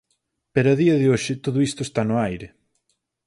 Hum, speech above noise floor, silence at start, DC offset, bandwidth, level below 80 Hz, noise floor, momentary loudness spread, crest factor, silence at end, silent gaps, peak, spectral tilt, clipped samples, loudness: none; 53 dB; 0.55 s; under 0.1%; 11.5 kHz; -54 dBFS; -73 dBFS; 8 LU; 18 dB; 0.8 s; none; -4 dBFS; -6.5 dB/octave; under 0.1%; -21 LUFS